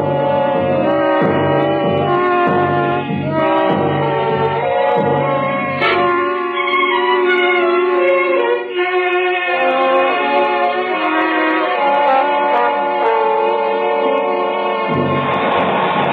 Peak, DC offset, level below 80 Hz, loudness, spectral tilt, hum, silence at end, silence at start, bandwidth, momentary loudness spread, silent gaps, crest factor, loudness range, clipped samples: -4 dBFS; under 0.1%; -60 dBFS; -15 LUFS; -8.5 dB/octave; none; 0 s; 0 s; 4.9 kHz; 3 LU; none; 10 dB; 1 LU; under 0.1%